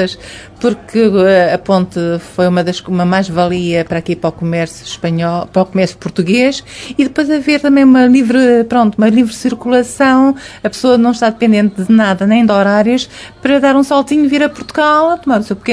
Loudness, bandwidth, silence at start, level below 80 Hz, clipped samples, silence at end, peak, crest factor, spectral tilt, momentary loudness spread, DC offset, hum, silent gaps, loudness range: -12 LUFS; 11 kHz; 0 s; -46 dBFS; under 0.1%; 0 s; 0 dBFS; 12 dB; -6 dB/octave; 9 LU; under 0.1%; none; none; 5 LU